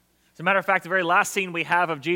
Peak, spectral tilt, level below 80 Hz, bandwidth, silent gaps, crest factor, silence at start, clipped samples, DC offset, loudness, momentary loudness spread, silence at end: -6 dBFS; -3.5 dB/octave; -74 dBFS; 17 kHz; none; 18 dB; 0.4 s; under 0.1%; under 0.1%; -22 LUFS; 4 LU; 0 s